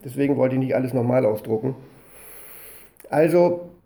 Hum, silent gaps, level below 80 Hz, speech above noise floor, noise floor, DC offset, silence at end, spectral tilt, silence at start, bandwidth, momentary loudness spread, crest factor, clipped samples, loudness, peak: none; none; -60 dBFS; 24 dB; -44 dBFS; under 0.1%; 0.15 s; -8 dB/octave; 0.05 s; over 20 kHz; 21 LU; 16 dB; under 0.1%; -21 LUFS; -6 dBFS